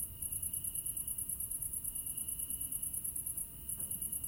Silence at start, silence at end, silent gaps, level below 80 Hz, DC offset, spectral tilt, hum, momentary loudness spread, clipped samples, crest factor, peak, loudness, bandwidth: 0 s; 0 s; none; -58 dBFS; under 0.1%; -1.5 dB/octave; none; 2 LU; under 0.1%; 16 dB; -24 dBFS; -37 LUFS; 17 kHz